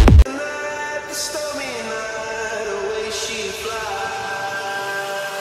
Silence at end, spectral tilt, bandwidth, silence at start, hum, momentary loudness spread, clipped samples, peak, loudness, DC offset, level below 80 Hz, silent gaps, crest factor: 0 s; -4.5 dB/octave; 14.5 kHz; 0 s; none; 4 LU; under 0.1%; 0 dBFS; -23 LUFS; under 0.1%; -24 dBFS; none; 20 dB